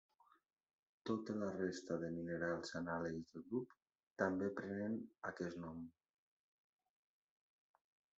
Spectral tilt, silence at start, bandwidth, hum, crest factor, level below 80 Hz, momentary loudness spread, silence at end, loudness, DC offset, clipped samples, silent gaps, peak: -5.5 dB/octave; 1.05 s; 7.6 kHz; none; 24 dB; -80 dBFS; 10 LU; 2.25 s; -45 LUFS; under 0.1%; under 0.1%; 3.82-3.86 s, 4.07-4.16 s; -22 dBFS